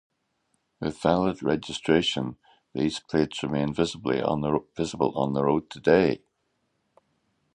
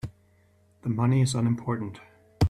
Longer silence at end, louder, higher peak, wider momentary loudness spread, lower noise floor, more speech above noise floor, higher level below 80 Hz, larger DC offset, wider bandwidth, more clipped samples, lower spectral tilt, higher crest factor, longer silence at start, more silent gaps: first, 1.35 s vs 0 s; about the same, -26 LUFS vs -27 LUFS; first, -6 dBFS vs -10 dBFS; second, 10 LU vs 17 LU; first, -75 dBFS vs -62 dBFS; first, 49 dB vs 37 dB; second, -54 dBFS vs -46 dBFS; neither; second, 10.5 kHz vs 12 kHz; neither; about the same, -6 dB/octave vs -6.5 dB/octave; about the same, 22 dB vs 18 dB; first, 0.8 s vs 0.05 s; neither